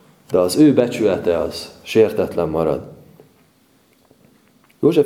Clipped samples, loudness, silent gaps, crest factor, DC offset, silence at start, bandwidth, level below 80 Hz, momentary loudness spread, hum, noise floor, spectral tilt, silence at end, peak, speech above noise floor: under 0.1%; -18 LUFS; none; 18 dB; under 0.1%; 0.3 s; 16 kHz; -50 dBFS; 9 LU; none; -56 dBFS; -6 dB/octave; 0 s; 0 dBFS; 40 dB